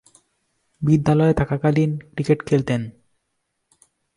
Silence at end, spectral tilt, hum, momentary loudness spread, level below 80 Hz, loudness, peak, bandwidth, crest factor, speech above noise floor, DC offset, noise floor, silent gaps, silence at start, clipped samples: 1.25 s; -8.5 dB/octave; none; 9 LU; -46 dBFS; -20 LUFS; -4 dBFS; 11 kHz; 18 dB; 56 dB; under 0.1%; -75 dBFS; none; 0.8 s; under 0.1%